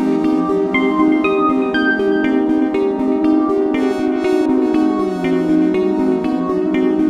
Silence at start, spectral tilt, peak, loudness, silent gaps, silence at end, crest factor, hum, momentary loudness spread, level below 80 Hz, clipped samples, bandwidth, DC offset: 0 s; -7 dB/octave; -4 dBFS; -16 LUFS; none; 0 s; 12 dB; none; 3 LU; -48 dBFS; under 0.1%; 9 kHz; under 0.1%